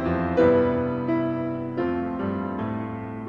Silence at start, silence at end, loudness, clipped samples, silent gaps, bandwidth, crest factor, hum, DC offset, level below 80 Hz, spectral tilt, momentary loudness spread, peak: 0 s; 0 s; -25 LUFS; under 0.1%; none; 5.4 kHz; 16 dB; none; 0.1%; -44 dBFS; -9.5 dB/octave; 10 LU; -8 dBFS